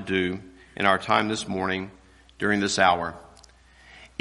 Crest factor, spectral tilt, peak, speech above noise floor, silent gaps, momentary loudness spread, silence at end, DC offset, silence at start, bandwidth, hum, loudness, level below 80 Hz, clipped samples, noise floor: 24 dB; -4 dB/octave; -4 dBFS; 29 dB; none; 17 LU; 0.15 s; under 0.1%; 0 s; 11.5 kHz; none; -24 LUFS; -58 dBFS; under 0.1%; -53 dBFS